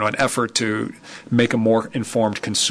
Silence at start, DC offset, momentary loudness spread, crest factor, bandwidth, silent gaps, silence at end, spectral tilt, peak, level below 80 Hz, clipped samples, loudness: 0 s; under 0.1%; 8 LU; 16 dB; 11 kHz; none; 0 s; -4 dB/octave; -6 dBFS; -58 dBFS; under 0.1%; -20 LUFS